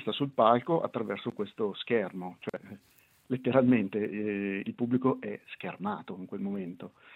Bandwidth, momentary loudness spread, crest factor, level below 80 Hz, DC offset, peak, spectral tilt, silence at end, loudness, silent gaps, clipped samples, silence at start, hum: 4.1 kHz; 16 LU; 22 dB; -76 dBFS; under 0.1%; -8 dBFS; -8.5 dB/octave; 0 s; -31 LUFS; none; under 0.1%; 0 s; none